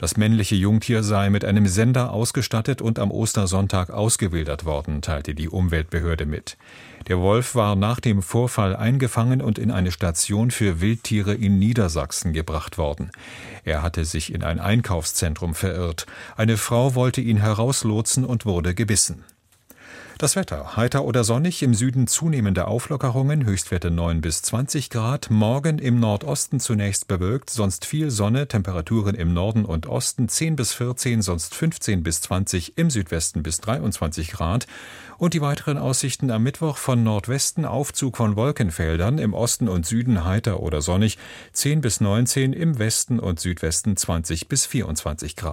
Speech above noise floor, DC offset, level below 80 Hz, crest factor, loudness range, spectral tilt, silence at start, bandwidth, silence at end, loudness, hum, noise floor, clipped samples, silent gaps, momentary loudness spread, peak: 32 dB; under 0.1%; -38 dBFS; 16 dB; 3 LU; -5 dB/octave; 0 s; 16.5 kHz; 0 s; -22 LUFS; none; -54 dBFS; under 0.1%; none; 7 LU; -4 dBFS